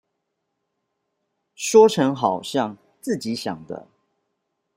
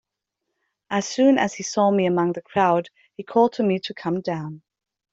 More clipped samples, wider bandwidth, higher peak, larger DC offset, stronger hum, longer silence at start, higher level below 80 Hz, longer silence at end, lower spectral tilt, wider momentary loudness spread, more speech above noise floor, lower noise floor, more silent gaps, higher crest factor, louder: neither; first, 16 kHz vs 8 kHz; first, -2 dBFS vs -6 dBFS; neither; neither; first, 1.6 s vs 0.9 s; about the same, -70 dBFS vs -66 dBFS; first, 0.95 s vs 0.55 s; about the same, -4.5 dB/octave vs -5.5 dB/octave; first, 20 LU vs 11 LU; about the same, 57 dB vs 60 dB; second, -77 dBFS vs -81 dBFS; neither; about the same, 22 dB vs 18 dB; about the same, -20 LUFS vs -22 LUFS